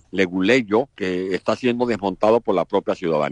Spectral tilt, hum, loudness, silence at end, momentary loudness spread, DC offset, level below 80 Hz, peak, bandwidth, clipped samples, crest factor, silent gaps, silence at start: -6 dB/octave; none; -20 LUFS; 0 s; 6 LU; under 0.1%; -56 dBFS; -6 dBFS; 10 kHz; under 0.1%; 16 dB; none; 0.15 s